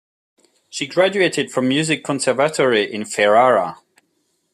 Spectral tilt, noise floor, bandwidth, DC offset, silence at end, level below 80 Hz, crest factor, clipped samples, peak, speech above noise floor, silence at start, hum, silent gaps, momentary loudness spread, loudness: -4 dB/octave; -67 dBFS; 14 kHz; under 0.1%; 0.8 s; -66 dBFS; 16 dB; under 0.1%; -2 dBFS; 50 dB; 0.75 s; none; none; 9 LU; -17 LUFS